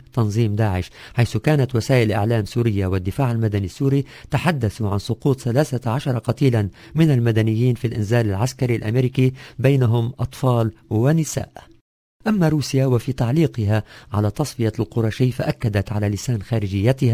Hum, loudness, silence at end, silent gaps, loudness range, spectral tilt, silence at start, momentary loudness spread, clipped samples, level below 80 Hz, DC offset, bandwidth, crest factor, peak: none; -20 LUFS; 0 s; 11.81-12.20 s; 2 LU; -7 dB/octave; 0.15 s; 5 LU; under 0.1%; -40 dBFS; under 0.1%; 16 kHz; 18 dB; -2 dBFS